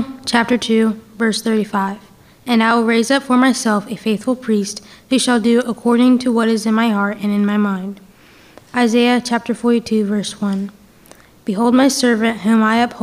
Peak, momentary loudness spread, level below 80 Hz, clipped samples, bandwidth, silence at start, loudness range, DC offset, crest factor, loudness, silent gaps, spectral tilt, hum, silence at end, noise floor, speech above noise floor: 0 dBFS; 9 LU; -58 dBFS; under 0.1%; 15 kHz; 0 s; 2 LU; under 0.1%; 16 dB; -16 LUFS; none; -4.5 dB/octave; none; 0 s; -45 dBFS; 30 dB